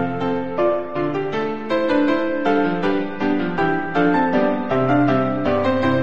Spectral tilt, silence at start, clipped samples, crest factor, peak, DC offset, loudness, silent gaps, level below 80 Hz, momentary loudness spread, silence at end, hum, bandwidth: -8 dB/octave; 0 s; under 0.1%; 14 dB; -6 dBFS; 2%; -20 LUFS; none; -52 dBFS; 6 LU; 0 s; none; 7.4 kHz